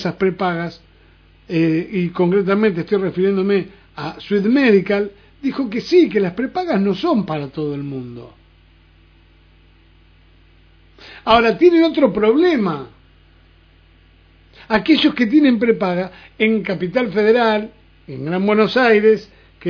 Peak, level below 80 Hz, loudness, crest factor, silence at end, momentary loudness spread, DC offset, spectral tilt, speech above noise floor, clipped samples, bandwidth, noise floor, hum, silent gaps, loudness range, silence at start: 0 dBFS; -50 dBFS; -17 LUFS; 18 dB; 0 s; 15 LU; under 0.1%; -7.5 dB/octave; 34 dB; under 0.1%; 5.4 kHz; -50 dBFS; none; none; 6 LU; 0 s